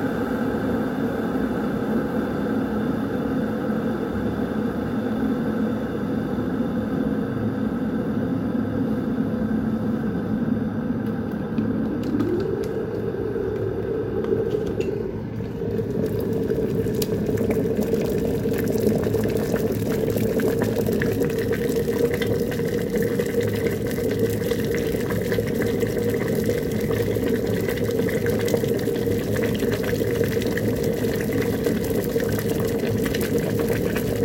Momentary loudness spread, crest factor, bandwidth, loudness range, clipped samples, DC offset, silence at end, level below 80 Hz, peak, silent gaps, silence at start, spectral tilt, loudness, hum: 3 LU; 16 dB; 17 kHz; 2 LU; under 0.1%; under 0.1%; 0 s; -42 dBFS; -6 dBFS; none; 0 s; -7 dB/octave; -24 LUFS; none